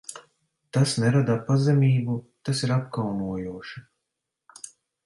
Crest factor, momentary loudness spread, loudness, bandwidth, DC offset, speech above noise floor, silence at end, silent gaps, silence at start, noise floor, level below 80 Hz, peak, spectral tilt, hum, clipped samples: 16 dB; 21 LU; -24 LUFS; 11.5 kHz; under 0.1%; 60 dB; 0.4 s; none; 0.1 s; -83 dBFS; -60 dBFS; -10 dBFS; -6.5 dB/octave; none; under 0.1%